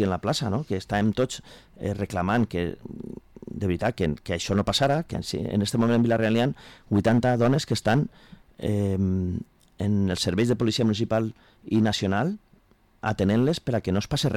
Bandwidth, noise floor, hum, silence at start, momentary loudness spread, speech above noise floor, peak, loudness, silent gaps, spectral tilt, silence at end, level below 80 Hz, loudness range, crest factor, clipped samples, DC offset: 15 kHz; -59 dBFS; none; 0 s; 11 LU; 35 dB; -14 dBFS; -25 LUFS; none; -6 dB/octave; 0 s; -48 dBFS; 4 LU; 12 dB; under 0.1%; under 0.1%